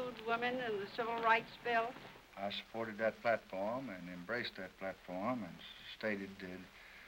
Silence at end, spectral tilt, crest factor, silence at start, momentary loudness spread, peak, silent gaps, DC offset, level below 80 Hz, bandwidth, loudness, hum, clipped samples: 0 s; -5 dB/octave; 22 dB; 0 s; 15 LU; -18 dBFS; none; under 0.1%; -72 dBFS; 16 kHz; -40 LUFS; none; under 0.1%